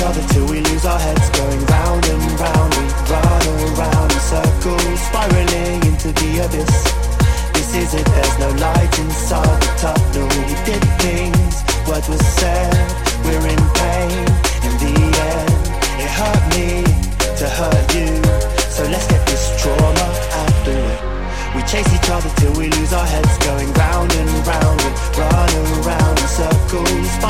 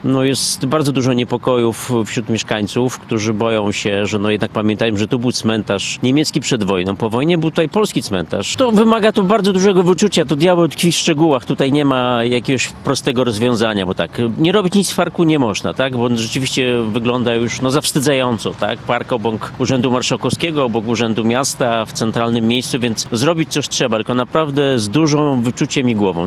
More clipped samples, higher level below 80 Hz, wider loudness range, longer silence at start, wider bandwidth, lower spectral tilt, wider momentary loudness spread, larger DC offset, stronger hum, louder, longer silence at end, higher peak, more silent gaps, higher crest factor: neither; first, -18 dBFS vs -48 dBFS; second, 1 LU vs 4 LU; about the same, 0 s vs 0 s; first, 16.5 kHz vs 14.5 kHz; about the same, -5 dB/octave vs -5 dB/octave; about the same, 4 LU vs 5 LU; first, 2% vs under 0.1%; neither; about the same, -16 LUFS vs -16 LUFS; about the same, 0 s vs 0 s; about the same, 0 dBFS vs 0 dBFS; neither; about the same, 14 dB vs 16 dB